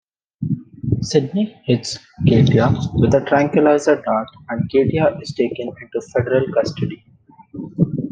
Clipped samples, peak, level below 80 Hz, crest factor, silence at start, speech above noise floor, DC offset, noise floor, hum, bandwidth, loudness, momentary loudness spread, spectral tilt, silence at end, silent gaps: under 0.1%; -2 dBFS; -46 dBFS; 16 dB; 0.4 s; 31 dB; under 0.1%; -49 dBFS; none; 9.4 kHz; -18 LUFS; 14 LU; -7 dB/octave; 0 s; none